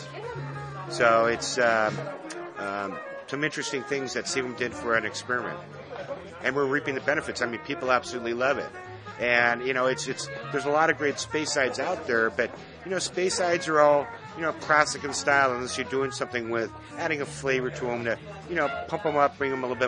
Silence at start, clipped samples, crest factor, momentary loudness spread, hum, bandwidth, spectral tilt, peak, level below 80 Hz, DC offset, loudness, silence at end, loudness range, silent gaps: 0 s; under 0.1%; 24 dB; 14 LU; none; 10.5 kHz; -3.5 dB/octave; -4 dBFS; -62 dBFS; under 0.1%; -26 LUFS; 0 s; 5 LU; none